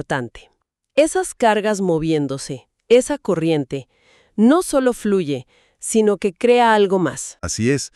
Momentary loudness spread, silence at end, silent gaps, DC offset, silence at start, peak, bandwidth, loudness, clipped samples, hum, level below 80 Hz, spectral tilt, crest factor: 14 LU; 0.1 s; none; under 0.1%; 0.1 s; -2 dBFS; 13.5 kHz; -18 LUFS; under 0.1%; none; -50 dBFS; -5 dB/octave; 16 dB